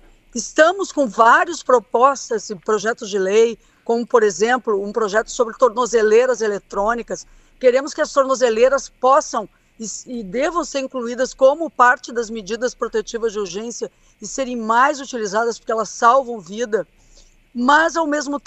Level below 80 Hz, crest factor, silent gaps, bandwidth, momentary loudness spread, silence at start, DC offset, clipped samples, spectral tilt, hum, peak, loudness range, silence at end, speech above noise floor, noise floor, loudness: -52 dBFS; 18 dB; none; 8.4 kHz; 13 LU; 0.35 s; under 0.1%; under 0.1%; -3 dB/octave; none; 0 dBFS; 3 LU; 0.05 s; 32 dB; -50 dBFS; -18 LUFS